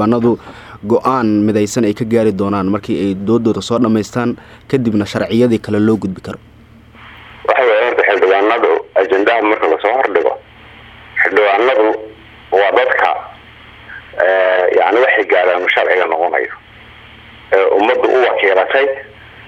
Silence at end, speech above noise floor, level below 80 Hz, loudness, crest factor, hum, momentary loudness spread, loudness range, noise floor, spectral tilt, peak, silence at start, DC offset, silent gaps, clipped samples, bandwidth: 0 s; 28 dB; -50 dBFS; -13 LUFS; 14 dB; none; 12 LU; 3 LU; -41 dBFS; -6 dB/octave; 0 dBFS; 0 s; under 0.1%; none; under 0.1%; 13 kHz